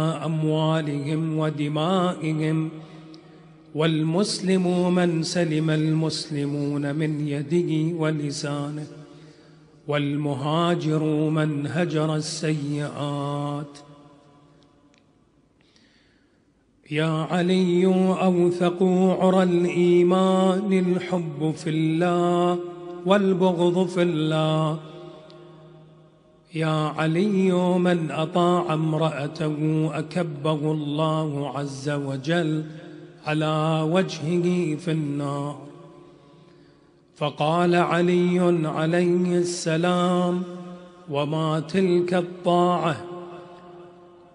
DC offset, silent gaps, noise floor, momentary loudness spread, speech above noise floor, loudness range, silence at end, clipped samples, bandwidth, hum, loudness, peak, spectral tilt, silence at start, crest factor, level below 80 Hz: under 0.1%; none; -62 dBFS; 10 LU; 40 dB; 6 LU; 0.4 s; under 0.1%; 10.5 kHz; none; -23 LUFS; -4 dBFS; -6.5 dB/octave; 0 s; 20 dB; -68 dBFS